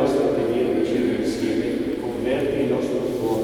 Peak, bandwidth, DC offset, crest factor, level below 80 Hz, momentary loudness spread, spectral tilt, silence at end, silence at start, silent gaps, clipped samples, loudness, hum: -6 dBFS; 17.5 kHz; under 0.1%; 14 dB; -48 dBFS; 4 LU; -6.5 dB/octave; 0 s; 0 s; none; under 0.1%; -23 LUFS; none